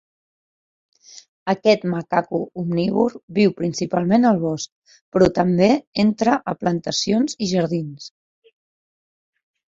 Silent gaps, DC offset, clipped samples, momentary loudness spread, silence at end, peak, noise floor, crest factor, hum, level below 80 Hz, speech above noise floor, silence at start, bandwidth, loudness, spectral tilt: 1.28-1.46 s, 3.23-3.28 s, 4.72-4.82 s, 5.01-5.12 s, 5.87-5.93 s; under 0.1%; under 0.1%; 10 LU; 1.6 s; -2 dBFS; under -90 dBFS; 18 dB; none; -54 dBFS; over 71 dB; 1.15 s; 7.8 kHz; -20 LUFS; -6 dB/octave